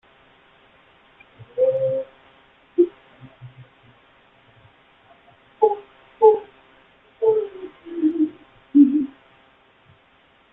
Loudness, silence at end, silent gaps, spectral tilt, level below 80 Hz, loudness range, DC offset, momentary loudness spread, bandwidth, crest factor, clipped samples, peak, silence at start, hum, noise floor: -21 LUFS; 1.45 s; none; -10.5 dB/octave; -68 dBFS; 8 LU; under 0.1%; 18 LU; 3.9 kHz; 22 dB; under 0.1%; -2 dBFS; 1.4 s; none; -57 dBFS